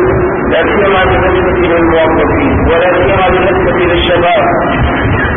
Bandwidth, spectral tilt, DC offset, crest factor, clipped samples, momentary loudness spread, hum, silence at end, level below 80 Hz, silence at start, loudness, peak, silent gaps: 3.7 kHz; -10.5 dB/octave; under 0.1%; 8 dB; under 0.1%; 3 LU; none; 0 s; -22 dBFS; 0 s; -9 LUFS; 0 dBFS; none